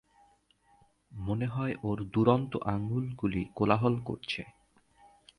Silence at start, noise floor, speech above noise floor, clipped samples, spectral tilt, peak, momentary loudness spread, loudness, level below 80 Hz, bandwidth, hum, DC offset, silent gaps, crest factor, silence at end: 1.1 s; -66 dBFS; 36 dB; under 0.1%; -8.5 dB/octave; -10 dBFS; 11 LU; -31 LUFS; -56 dBFS; 10.5 kHz; none; under 0.1%; none; 22 dB; 0.9 s